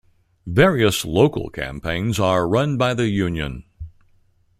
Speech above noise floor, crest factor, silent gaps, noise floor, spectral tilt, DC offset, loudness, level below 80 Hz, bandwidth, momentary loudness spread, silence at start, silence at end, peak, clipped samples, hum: 39 dB; 20 dB; none; -58 dBFS; -5.5 dB/octave; under 0.1%; -20 LUFS; -42 dBFS; 16 kHz; 21 LU; 0.45 s; 0.7 s; -2 dBFS; under 0.1%; none